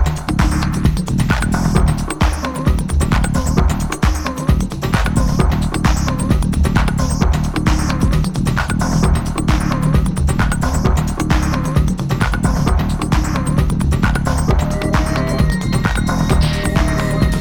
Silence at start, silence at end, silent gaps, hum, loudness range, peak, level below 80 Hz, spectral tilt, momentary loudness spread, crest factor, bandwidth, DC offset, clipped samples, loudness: 0 s; 0 s; none; none; 1 LU; 0 dBFS; -18 dBFS; -6 dB/octave; 2 LU; 14 dB; 18.5 kHz; under 0.1%; under 0.1%; -17 LUFS